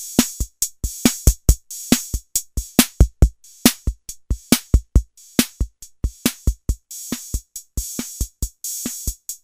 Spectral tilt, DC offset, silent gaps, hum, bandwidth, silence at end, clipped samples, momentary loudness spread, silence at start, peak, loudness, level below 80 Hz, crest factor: -4 dB/octave; under 0.1%; none; none; 16 kHz; 0.1 s; under 0.1%; 12 LU; 0 s; 0 dBFS; -22 LUFS; -24 dBFS; 20 dB